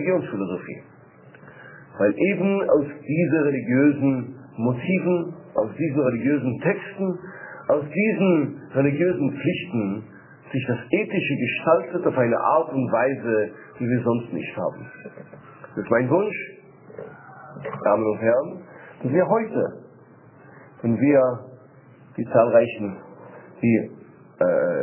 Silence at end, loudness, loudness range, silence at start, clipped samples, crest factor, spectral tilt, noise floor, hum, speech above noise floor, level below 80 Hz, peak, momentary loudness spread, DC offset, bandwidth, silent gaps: 0 s; -23 LUFS; 4 LU; 0 s; under 0.1%; 18 dB; -11.5 dB/octave; -49 dBFS; none; 27 dB; -64 dBFS; -4 dBFS; 19 LU; under 0.1%; 3.2 kHz; none